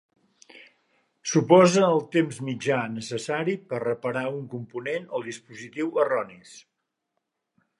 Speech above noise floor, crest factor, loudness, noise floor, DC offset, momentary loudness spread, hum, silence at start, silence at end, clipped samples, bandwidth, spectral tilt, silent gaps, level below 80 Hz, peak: 56 dB; 22 dB; -25 LUFS; -80 dBFS; under 0.1%; 17 LU; none; 0.55 s; 1.2 s; under 0.1%; 11.5 kHz; -5.5 dB/octave; none; -74 dBFS; -4 dBFS